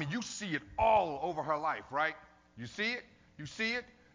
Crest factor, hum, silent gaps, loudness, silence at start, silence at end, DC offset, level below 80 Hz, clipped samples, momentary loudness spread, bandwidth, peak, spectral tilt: 18 dB; none; none; -34 LUFS; 0 s; 0.3 s; under 0.1%; -60 dBFS; under 0.1%; 18 LU; 7.6 kHz; -16 dBFS; -4 dB/octave